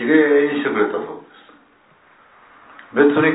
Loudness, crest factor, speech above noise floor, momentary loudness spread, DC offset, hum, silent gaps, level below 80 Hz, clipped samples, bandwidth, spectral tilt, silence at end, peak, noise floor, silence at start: -17 LUFS; 18 dB; 38 dB; 16 LU; under 0.1%; none; none; -68 dBFS; under 0.1%; 4 kHz; -10 dB/octave; 0 s; -2 dBFS; -53 dBFS; 0 s